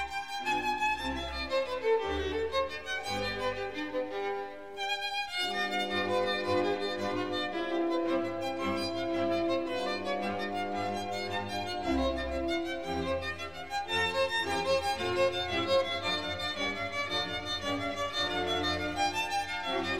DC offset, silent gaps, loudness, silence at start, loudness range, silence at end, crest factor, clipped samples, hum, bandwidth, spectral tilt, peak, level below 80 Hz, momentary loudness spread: 0.3%; none; -32 LUFS; 0 s; 3 LU; 0 s; 14 dB; under 0.1%; none; 16 kHz; -4 dB/octave; -18 dBFS; -52 dBFS; 5 LU